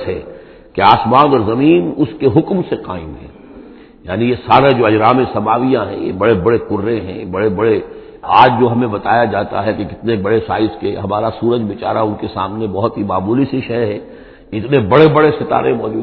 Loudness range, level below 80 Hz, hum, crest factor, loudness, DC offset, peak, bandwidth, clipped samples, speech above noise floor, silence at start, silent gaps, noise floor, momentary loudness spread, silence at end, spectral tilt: 4 LU; -44 dBFS; none; 14 dB; -14 LUFS; under 0.1%; 0 dBFS; 5.4 kHz; 0.2%; 24 dB; 0 s; none; -37 dBFS; 13 LU; 0 s; -9.5 dB/octave